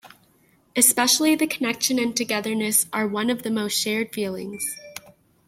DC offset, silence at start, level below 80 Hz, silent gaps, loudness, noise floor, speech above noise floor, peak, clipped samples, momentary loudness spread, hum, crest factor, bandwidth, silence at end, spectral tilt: under 0.1%; 0.05 s; -68 dBFS; none; -21 LUFS; -60 dBFS; 38 dB; -2 dBFS; under 0.1%; 12 LU; none; 22 dB; 16.5 kHz; 0.4 s; -2 dB/octave